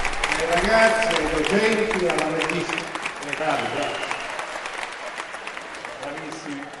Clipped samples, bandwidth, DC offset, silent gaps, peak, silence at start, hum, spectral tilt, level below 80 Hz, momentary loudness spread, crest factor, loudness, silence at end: under 0.1%; 11.5 kHz; under 0.1%; none; -4 dBFS; 0 s; none; -3.5 dB/octave; -42 dBFS; 14 LU; 20 dB; -23 LUFS; 0 s